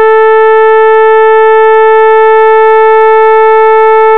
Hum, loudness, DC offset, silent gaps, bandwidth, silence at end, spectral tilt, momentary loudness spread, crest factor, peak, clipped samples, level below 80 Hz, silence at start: none; -4 LUFS; 7%; none; 4.2 kHz; 0 s; -4 dB/octave; 0 LU; 4 dB; 0 dBFS; 3%; -60 dBFS; 0 s